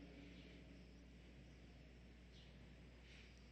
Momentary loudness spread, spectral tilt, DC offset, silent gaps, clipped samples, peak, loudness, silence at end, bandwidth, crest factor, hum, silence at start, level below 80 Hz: 3 LU; -5.5 dB/octave; under 0.1%; none; under 0.1%; -48 dBFS; -63 LUFS; 0 s; 8.4 kHz; 14 dB; 60 Hz at -65 dBFS; 0 s; -66 dBFS